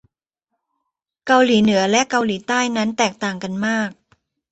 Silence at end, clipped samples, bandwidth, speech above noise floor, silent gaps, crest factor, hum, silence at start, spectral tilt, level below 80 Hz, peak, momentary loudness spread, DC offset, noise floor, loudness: 0.6 s; under 0.1%; 8.2 kHz; 61 dB; none; 18 dB; none; 1.25 s; -4 dB/octave; -60 dBFS; -2 dBFS; 10 LU; under 0.1%; -79 dBFS; -18 LUFS